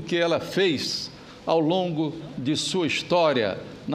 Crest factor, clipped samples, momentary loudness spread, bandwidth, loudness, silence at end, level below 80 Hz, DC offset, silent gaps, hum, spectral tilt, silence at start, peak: 16 dB; under 0.1%; 9 LU; 15.5 kHz; -24 LUFS; 0 s; -60 dBFS; under 0.1%; none; none; -4.5 dB/octave; 0 s; -8 dBFS